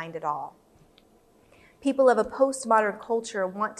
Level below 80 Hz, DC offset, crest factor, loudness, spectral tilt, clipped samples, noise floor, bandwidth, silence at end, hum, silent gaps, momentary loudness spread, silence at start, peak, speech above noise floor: -64 dBFS; under 0.1%; 20 dB; -25 LUFS; -4.5 dB/octave; under 0.1%; -60 dBFS; 12.5 kHz; 0.05 s; none; none; 10 LU; 0 s; -8 dBFS; 34 dB